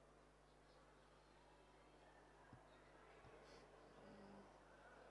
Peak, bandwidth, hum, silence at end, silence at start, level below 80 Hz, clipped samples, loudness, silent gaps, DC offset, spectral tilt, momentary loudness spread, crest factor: -52 dBFS; 11 kHz; 50 Hz at -75 dBFS; 0 s; 0 s; -78 dBFS; under 0.1%; -66 LUFS; none; under 0.1%; -5 dB/octave; 6 LU; 16 dB